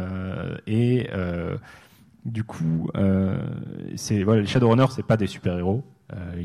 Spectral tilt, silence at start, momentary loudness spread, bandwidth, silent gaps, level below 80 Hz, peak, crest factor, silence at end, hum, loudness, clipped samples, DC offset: -7 dB/octave; 0 s; 15 LU; 12.5 kHz; none; -52 dBFS; -6 dBFS; 18 dB; 0 s; none; -24 LUFS; under 0.1%; under 0.1%